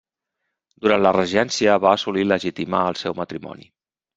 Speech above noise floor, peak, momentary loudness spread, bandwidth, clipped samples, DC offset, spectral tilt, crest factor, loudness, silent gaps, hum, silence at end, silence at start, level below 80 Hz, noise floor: 59 dB; -2 dBFS; 13 LU; 8 kHz; under 0.1%; under 0.1%; -4.5 dB/octave; 20 dB; -20 LUFS; none; none; 0.55 s; 0.8 s; -60 dBFS; -79 dBFS